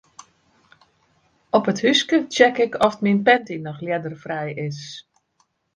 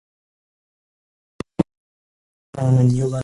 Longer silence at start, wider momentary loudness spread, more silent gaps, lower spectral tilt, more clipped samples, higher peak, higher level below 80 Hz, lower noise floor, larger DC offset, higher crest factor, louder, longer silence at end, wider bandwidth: about the same, 1.55 s vs 1.6 s; second, 14 LU vs 20 LU; second, none vs 1.77-2.53 s; second, -4.5 dB/octave vs -8.5 dB/octave; neither; about the same, 0 dBFS vs -2 dBFS; second, -64 dBFS vs -50 dBFS; second, -67 dBFS vs under -90 dBFS; neither; about the same, 22 dB vs 20 dB; about the same, -20 LUFS vs -20 LUFS; first, 0.75 s vs 0 s; about the same, 10.5 kHz vs 11 kHz